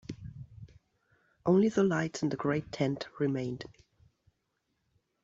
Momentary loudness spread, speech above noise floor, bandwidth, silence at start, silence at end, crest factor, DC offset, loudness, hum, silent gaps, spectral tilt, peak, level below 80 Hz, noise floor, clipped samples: 21 LU; 50 dB; 8 kHz; 0.1 s; 1.55 s; 20 dB; under 0.1%; -31 LUFS; none; none; -7 dB/octave; -14 dBFS; -64 dBFS; -80 dBFS; under 0.1%